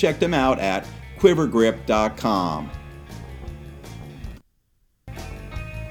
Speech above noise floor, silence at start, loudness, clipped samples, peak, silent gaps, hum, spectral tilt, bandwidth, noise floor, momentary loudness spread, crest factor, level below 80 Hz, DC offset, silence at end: 45 dB; 0 s; -21 LUFS; under 0.1%; -2 dBFS; none; none; -6 dB/octave; 18 kHz; -65 dBFS; 21 LU; 22 dB; -40 dBFS; under 0.1%; 0 s